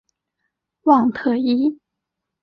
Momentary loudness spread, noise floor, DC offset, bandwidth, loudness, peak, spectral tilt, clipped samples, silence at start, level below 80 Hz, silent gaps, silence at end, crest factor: 7 LU; -81 dBFS; under 0.1%; 5.8 kHz; -18 LUFS; -4 dBFS; -7.5 dB/octave; under 0.1%; 0.85 s; -64 dBFS; none; 0.7 s; 18 dB